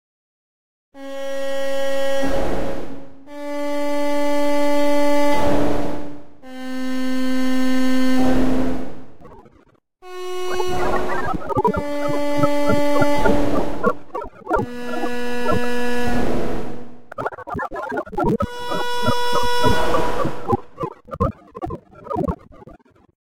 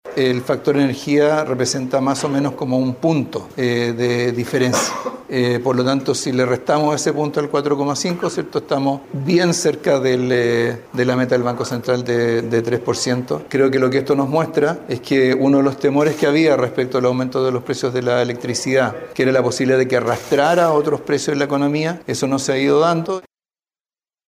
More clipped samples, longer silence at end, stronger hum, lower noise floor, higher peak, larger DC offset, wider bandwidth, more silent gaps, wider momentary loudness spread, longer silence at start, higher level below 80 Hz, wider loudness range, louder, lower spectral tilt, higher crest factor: neither; second, 0.15 s vs 1.1 s; neither; second, -55 dBFS vs under -90 dBFS; first, 0 dBFS vs -4 dBFS; first, 10% vs under 0.1%; about the same, 16.5 kHz vs 15.5 kHz; neither; first, 14 LU vs 6 LU; first, 0.9 s vs 0.05 s; first, -38 dBFS vs -58 dBFS; about the same, 4 LU vs 2 LU; second, -22 LUFS vs -18 LUFS; about the same, -5.5 dB/octave vs -5 dB/octave; about the same, 18 dB vs 14 dB